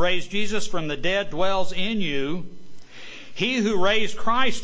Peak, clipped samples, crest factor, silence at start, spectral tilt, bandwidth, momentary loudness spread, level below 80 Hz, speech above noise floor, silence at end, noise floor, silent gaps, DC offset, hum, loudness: -6 dBFS; under 0.1%; 14 dB; 0 s; -4 dB/octave; 8 kHz; 16 LU; -46 dBFS; 20 dB; 0 s; -40 dBFS; none; under 0.1%; none; -25 LUFS